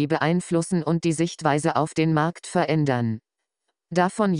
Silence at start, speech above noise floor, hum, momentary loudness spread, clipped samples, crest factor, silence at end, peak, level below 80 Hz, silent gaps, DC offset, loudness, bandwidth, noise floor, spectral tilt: 0 s; 57 dB; none; 4 LU; under 0.1%; 18 dB; 0 s; -6 dBFS; -60 dBFS; none; under 0.1%; -23 LUFS; 11 kHz; -79 dBFS; -6 dB/octave